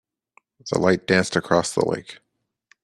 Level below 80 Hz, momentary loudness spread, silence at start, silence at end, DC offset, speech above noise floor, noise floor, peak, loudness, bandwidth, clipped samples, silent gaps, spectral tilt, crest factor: -58 dBFS; 14 LU; 0.65 s; 0.7 s; under 0.1%; 41 dB; -62 dBFS; -2 dBFS; -21 LUFS; 12.5 kHz; under 0.1%; none; -4.5 dB/octave; 22 dB